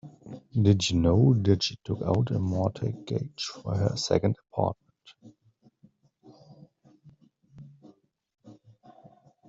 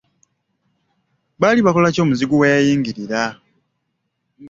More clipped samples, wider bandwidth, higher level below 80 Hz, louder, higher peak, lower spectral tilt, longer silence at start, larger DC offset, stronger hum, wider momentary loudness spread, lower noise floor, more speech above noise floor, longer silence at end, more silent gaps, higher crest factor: neither; about the same, 7.8 kHz vs 7.8 kHz; about the same, -54 dBFS vs -56 dBFS; second, -27 LUFS vs -16 LUFS; second, -8 dBFS vs -2 dBFS; about the same, -6.5 dB/octave vs -6 dB/octave; second, 0.05 s vs 1.4 s; neither; neither; first, 12 LU vs 8 LU; second, -64 dBFS vs -73 dBFS; second, 39 dB vs 57 dB; first, 0.95 s vs 0 s; neither; about the same, 22 dB vs 18 dB